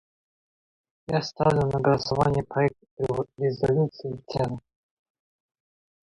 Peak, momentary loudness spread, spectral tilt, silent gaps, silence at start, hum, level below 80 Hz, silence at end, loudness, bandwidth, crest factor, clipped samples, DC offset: -8 dBFS; 9 LU; -7 dB/octave; 2.91-2.97 s; 1.1 s; none; -52 dBFS; 1.45 s; -26 LUFS; 11 kHz; 18 dB; under 0.1%; under 0.1%